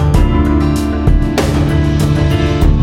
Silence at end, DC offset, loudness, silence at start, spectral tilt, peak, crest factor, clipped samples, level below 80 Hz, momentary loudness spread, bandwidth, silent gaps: 0 s; under 0.1%; -13 LUFS; 0 s; -7 dB/octave; 0 dBFS; 10 dB; under 0.1%; -14 dBFS; 2 LU; 15.5 kHz; none